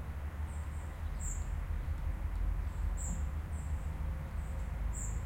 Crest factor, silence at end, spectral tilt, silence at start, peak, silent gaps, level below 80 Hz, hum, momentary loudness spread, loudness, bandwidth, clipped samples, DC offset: 12 dB; 0 s; -5.5 dB/octave; 0 s; -26 dBFS; none; -38 dBFS; none; 3 LU; -40 LUFS; 16 kHz; under 0.1%; under 0.1%